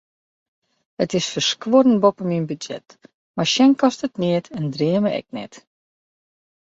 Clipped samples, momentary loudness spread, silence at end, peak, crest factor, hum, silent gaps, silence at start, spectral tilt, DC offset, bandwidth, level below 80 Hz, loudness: under 0.1%; 17 LU; 1.15 s; -4 dBFS; 18 dB; none; 3.14-3.34 s; 1 s; -5 dB/octave; under 0.1%; 8 kHz; -64 dBFS; -19 LUFS